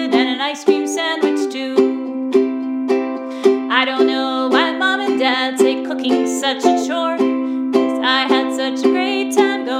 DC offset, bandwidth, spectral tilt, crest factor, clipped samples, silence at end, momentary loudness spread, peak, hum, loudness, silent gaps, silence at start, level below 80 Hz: under 0.1%; 15 kHz; -2.5 dB/octave; 16 dB; under 0.1%; 0 s; 4 LU; 0 dBFS; none; -17 LUFS; none; 0 s; -76 dBFS